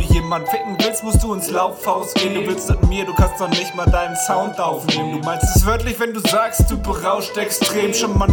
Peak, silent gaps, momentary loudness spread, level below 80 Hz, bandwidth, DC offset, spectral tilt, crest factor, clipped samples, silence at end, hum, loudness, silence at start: 0 dBFS; none; 4 LU; -24 dBFS; over 20 kHz; under 0.1%; -4.5 dB/octave; 16 dB; under 0.1%; 0 s; none; -18 LUFS; 0 s